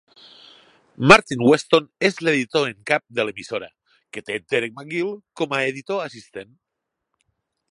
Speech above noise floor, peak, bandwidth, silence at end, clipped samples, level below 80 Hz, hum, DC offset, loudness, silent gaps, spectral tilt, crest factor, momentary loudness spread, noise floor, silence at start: 61 dB; 0 dBFS; 11.5 kHz; 1.3 s; under 0.1%; -58 dBFS; none; under 0.1%; -20 LUFS; none; -4.5 dB/octave; 22 dB; 19 LU; -81 dBFS; 1 s